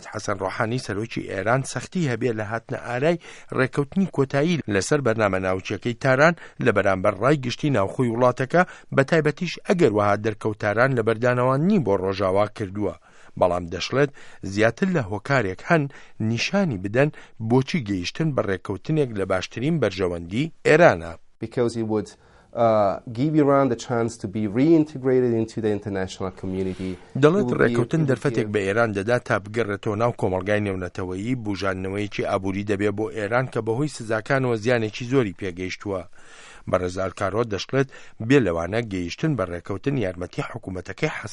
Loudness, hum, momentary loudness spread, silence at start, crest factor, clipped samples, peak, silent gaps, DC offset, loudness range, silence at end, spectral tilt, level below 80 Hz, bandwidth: -23 LUFS; none; 10 LU; 0 s; 22 dB; under 0.1%; 0 dBFS; none; under 0.1%; 4 LU; 0 s; -6.5 dB/octave; -54 dBFS; 11.5 kHz